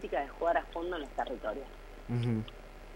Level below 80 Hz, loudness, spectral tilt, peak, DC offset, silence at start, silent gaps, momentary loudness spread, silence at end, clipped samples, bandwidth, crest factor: -50 dBFS; -35 LUFS; -7.5 dB/octave; -18 dBFS; under 0.1%; 0 s; none; 16 LU; 0 s; under 0.1%; 16 kHz; 18 dB